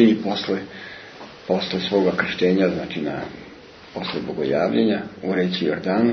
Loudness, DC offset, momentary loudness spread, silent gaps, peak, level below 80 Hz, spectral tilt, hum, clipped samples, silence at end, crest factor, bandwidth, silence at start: -22 LUFS; under 0.1%; 18 LU; none; -4 dBFS; -58 dBFS; -7 dB/octave; none; under 0.1%; 0 s; 18 dB; 6.4 kHz; 0 s